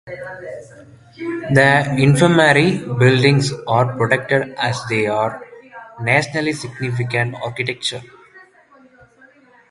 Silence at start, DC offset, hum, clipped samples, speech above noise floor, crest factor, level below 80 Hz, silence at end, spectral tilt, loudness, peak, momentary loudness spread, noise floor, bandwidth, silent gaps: 0.05 s; under 0.1%; none; under 0.1%; 33 dB; 18 dB; -52 dBFS; 1.3 s; -5.5 dB/octave; -16 LUFS; 0 dBFS; 19 LU; -50 dBFS; 11.5 kHz; none